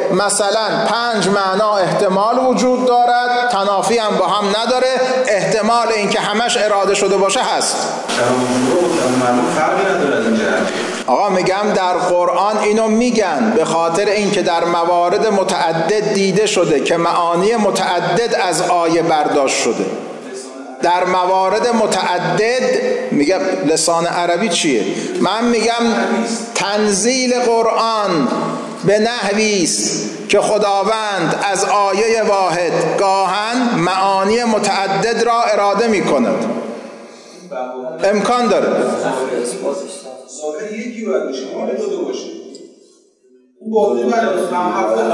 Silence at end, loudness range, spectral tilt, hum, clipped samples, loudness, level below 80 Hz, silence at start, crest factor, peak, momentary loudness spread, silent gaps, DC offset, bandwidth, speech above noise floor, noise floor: 0 s; 4 LU; -3.5 dB/octave; none; under 0.1%; -15 LUFS; -58 dBFS; 0 s; 12 dB; -4 dBFS; 7 LU; none; under 0.1%; 11.5 kHz; 36 dB; -51 dBFS